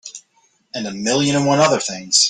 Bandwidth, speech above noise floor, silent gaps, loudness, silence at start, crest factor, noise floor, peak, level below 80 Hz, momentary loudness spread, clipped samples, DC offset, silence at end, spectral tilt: 10 kHz; 43 dB; none; -17 LUFS; 0.05 s; 18 dB; -60 dBFS; 0 dBFS; -58 dBFS; 15 LU; under 0.1%; under 0.1%; 0 s; -3 dB/octave